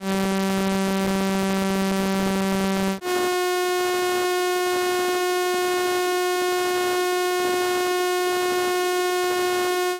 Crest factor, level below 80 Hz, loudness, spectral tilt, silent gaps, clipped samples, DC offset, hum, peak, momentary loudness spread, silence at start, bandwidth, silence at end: 10 dB; -52 dBFS; -22 LUFS; -4 dB/octave; none; under 0.1%; under 0.1%; none; -12 dBFS; 1 LU; 0 s; 17 kHz; 0 s